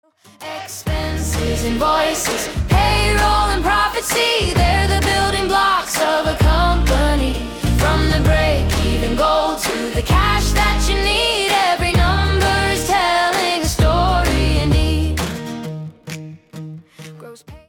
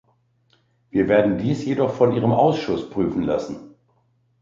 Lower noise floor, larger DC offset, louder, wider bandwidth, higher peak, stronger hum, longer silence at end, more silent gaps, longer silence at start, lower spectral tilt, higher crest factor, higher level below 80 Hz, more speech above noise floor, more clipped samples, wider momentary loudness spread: second, -38 dBFS vs -64 dBFS; neither; first, -16 LUFS vs -21 LUFS; first, 18 kHz vs 7.6 kHz; about the same, -4 dBFS vs -4 dBFS; neither; second, 0.1 s vs 0.75 s; neither; second, 0.4 s vs 0.95 s; second, -4.5 dB/octave vs -8 dB/octave; about the same, 14 dB vs 18 dB; first, -22 dBFS vs -52 dBFS; second, 21 dB vs 44 dB; neither; first, 13 LU vs 8 LU